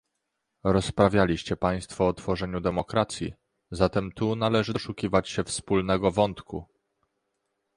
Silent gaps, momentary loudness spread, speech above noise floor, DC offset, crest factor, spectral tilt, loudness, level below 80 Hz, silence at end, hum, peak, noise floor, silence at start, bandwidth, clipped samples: none; 9 LU; 55 dB; under 0.1%; 22 dB; -5.5 dB/octave; -26 LUFS; -46 dBFS; 1.15 s; none; -6 dBFS; -80 dBFS; 0.65 s; 11.5 kHz; under 0.1%